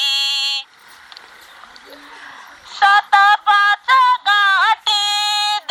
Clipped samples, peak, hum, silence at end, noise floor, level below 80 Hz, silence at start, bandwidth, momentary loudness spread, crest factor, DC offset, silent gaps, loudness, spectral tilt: under 0.1%; 0 dBFS; none; 0.1 s; -44 dBFS; -68 dBFS; 0 s; 16.5 kHz; 6 LU; 16 dB; under 0.1%; none; -13 LUFS; 3.5 dB/octave